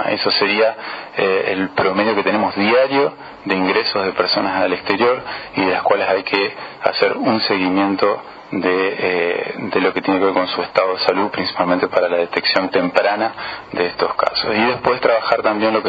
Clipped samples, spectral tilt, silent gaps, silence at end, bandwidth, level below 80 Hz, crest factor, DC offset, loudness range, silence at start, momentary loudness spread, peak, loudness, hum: under 0.1%; -6.5 dB/octave; none; 0 s; 7.2 kHz; -58 dBFS; 18 dB; under 0.1%; 1 LU; 0 s; 6 LU; 0 dBFS; -17 LUFS; none